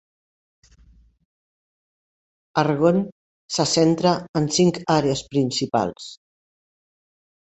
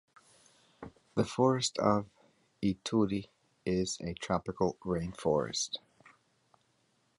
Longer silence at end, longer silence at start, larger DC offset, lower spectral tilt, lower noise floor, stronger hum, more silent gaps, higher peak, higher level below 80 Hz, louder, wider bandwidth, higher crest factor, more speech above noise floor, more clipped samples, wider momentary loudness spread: about the same, 1.35 s vs 1.4 s; first, 2.55 s vs 0.8 s; neither; about the same, -5 dB/octave vs -5 dB/octave; second, -54 dBFS vs -73 dBFS; neither; first, 3.12-3.49 s, 4.29-4.34 s vs none; first, -4 dBFS vs -14 dBFS; about the same, -56 dBFS vs -58 dBFS; first, -21 LUFS vs -33 LUFS; second, 8.4 kHz vs 11.5 kHz; about the same, 20 dB vs 22 dB; second, 34 dB vs 42 dB; neither; second, 10 LU vs 13 LU